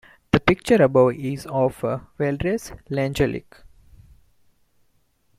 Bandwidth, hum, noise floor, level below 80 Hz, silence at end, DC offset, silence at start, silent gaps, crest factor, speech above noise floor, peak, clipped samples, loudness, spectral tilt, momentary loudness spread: 15 kHz; none; -65 dBFS; -46 dBFS; 1.7 s; under 0.1%; 0.35 s; none; 20 dB; 44 dB; -2 dBFS; under 0.1%; -22 LUFS; -6.5 dB/octave; 12 LU